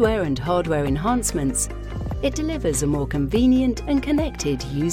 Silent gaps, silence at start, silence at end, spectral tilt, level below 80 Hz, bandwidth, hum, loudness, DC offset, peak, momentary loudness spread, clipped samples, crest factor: none; 0 s; 0 s; -5.5 dB/octave; -32 dBFS; 16 kHz; none; -22 LUFS; under 0.1%; -6 dBFS; 7 LU; under 0.1%; 16 dB